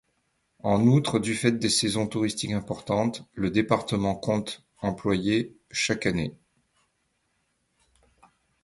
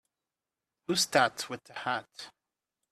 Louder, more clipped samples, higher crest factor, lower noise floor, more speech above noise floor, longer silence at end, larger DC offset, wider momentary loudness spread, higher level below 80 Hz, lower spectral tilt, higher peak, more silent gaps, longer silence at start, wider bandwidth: first, -26 LUFS vs -30 LUFS; neither; about the same, 22 dB vs 26 dB; second, -74 dBFS vs -90 dBFS; second, 48 dB vs 59 dB; first, 2.3 s vs 0.6 s; neither; second, 9 LU vs 21 LU; first, -54 dBFS vs -74 dBFS; first, -5 dB/octave vs -2 dB/octave; about the same, -6 dBFS vs -8 dBFS; neither; second, 0.65 s vs 0.9 s; second, 11.5 kHz vs 15 kHz